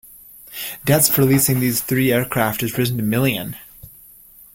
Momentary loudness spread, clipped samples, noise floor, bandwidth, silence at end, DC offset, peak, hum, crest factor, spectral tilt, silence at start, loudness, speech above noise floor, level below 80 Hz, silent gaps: 15 LU; under 0.1%; -46 dBFS; 17 kHz; 0.65 s; under 0.1%; -2 dBFS; none; 18 dB; -4.5 dB/octave; 0.45 s; -18 LUFS; 28 dB; -48 dBFS; none